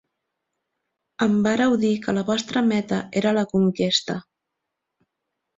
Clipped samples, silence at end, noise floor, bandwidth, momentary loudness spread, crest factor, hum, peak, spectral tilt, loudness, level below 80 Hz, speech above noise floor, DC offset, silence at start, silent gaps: under 0.1%; 1.35 s; -81 dBFS; 7.8 kHz; 5 LU; 18 dB; none; -6 dBFS; -5 dB/octave; -22 LUFS; -60 dBFS; 60 dB; under 0.1%; 1.2 s; none